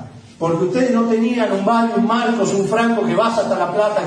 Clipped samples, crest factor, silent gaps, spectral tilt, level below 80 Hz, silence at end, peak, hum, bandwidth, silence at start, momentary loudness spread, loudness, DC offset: under 0.1%; 12 dB; none; -5.5 dB/octave; -60 dBFS; 0 s; -4 dBFS; none; 10.5 kHz; 0 s; 2 LU; -17 LUFS; under 0.1%